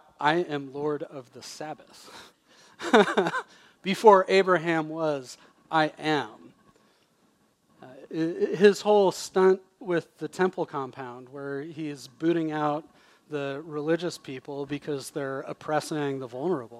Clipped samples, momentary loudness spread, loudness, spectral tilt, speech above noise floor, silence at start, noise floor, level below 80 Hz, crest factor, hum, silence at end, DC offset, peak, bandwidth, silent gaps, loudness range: under 0.1%; 18 LU; -26 LUFS; -5 dB/octave; 40 dB; 0.2 s; -66 dBFS; -76 dBFS; 24 dB; none; 0 s; under 0.1%; -4 dBFS; 13.5 kHz; none; 8 LU